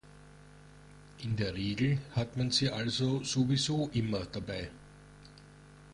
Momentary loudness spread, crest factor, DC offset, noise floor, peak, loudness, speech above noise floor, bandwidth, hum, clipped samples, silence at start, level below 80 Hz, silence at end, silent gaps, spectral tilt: 10 LU; 18 dB; under 0.1%; -55 dBFS; -16 dBFS; -32 LUFS; 23 dB; 11.5 kHz; 50 Hz at -55 dBFS; under 0.1%; 0.05 s; -56 dBFS; 0 s; none; -5 dB/octave